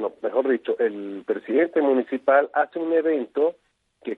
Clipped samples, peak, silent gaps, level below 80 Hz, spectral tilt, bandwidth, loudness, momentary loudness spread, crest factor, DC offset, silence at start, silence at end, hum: under 0.1%; -4 dBFS; none; -78 dBFS; -7.5 dB/octave; 4.1 kHz; -23 LUFS; 8 LU; 18 dB; under 0.1%; 0 s; 0 s; none